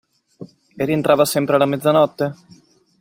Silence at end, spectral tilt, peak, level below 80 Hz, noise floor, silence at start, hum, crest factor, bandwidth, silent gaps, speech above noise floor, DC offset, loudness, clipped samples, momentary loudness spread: 0.65 s; -5.5 dB/octave; -2 dBFS; -60 dBFS; -41 dBFS; 0.4 s; none; 18 dB; 16.5 kHz; none; 24 dB; under 0.1%; -17 LUFS; under 0.1%; 10 LU